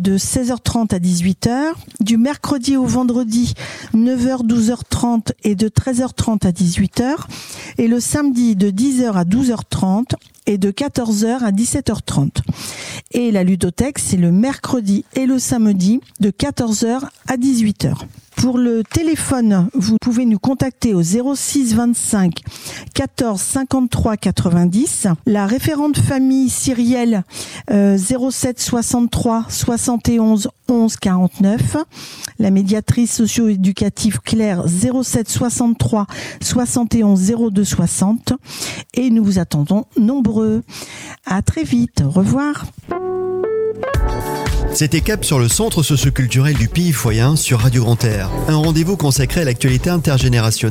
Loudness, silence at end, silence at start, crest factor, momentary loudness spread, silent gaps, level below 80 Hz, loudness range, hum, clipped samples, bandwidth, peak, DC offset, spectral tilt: -16 LUFS; 0 s; 0 s; 14 dB; 7 LU; none; -34 dBFS; 3 LU; none; under 0.1%; 16.5 kHz; -2 dBFS; under 0.1%; -5.5 dB/octave